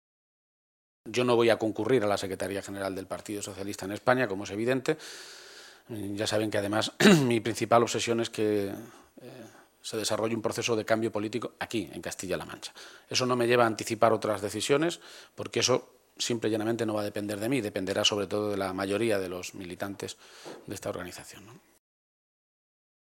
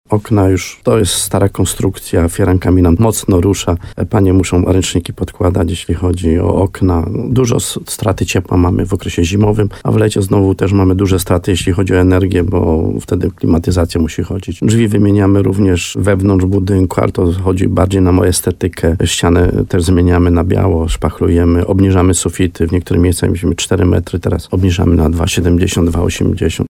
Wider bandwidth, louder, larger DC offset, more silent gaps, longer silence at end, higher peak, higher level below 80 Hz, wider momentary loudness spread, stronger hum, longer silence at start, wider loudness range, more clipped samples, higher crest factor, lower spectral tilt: about the same, 16.5 kHz vs 16 kHz; second, -29 LUFS vs -13 LUFS; neither; neither; first, 1.6 s vs 0.05 s; about the same, -2 dBFS vs 0 dBFS; second, -70 dBFS vs -26 dBFS; first, 18 LU vs 6 LU; neither; first, 1.05 s vs 0.1 s; first, 6 LU vs 2 LU; neither; first, 28 dB vs 12 dB; second, -4 dB/octave vs -6 dB/octave